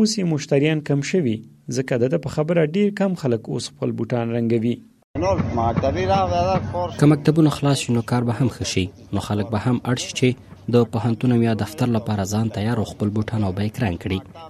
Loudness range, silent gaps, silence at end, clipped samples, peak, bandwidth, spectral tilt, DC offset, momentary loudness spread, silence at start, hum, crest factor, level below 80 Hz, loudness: 3 LU; 5.04-5.14 s; 0 s; under 0.1%; -2 dBFS; 13.5 kHz; -6.5 dB/octave; under 0.1%; 7 LU; 0 s; none; 18 dB; -46 dBFS; -21 LUFS